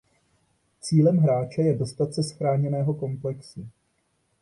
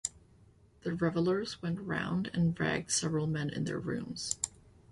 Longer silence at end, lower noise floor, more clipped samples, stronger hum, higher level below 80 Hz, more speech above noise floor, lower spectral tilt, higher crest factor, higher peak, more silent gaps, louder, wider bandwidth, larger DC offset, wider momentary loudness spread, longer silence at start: first, 0.75 s vs 0.35 s; first, -71 dBFS vs -62 dBFS; neither; neither; about the same, -62 dBFS vs -60 dBFS; first, 47 dB vs 29 dB; first, -7.5 dB/octave vs -4.5 dB/octave; second, 16 dB vs 22 dB; first, -8 dBFS vs -12 dBFS; neither; first, -24 LUFS vs -34 LUFS; about the same, 11.5 kHz vs 11.5 kHz; neither; first, 18 LU vs 7 LU; first, 0.85 s vs 0.05 s